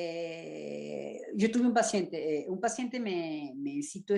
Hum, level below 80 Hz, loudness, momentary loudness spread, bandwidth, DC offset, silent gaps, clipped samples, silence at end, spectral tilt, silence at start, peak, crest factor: none; -78 dBFS; -33 LUFS; 13 LU; 11.5 kHz; under 0.1%; none; under 0.1%; 0 s; -4.5 dB/octave; 0 s; -14 dBFS; 18 dB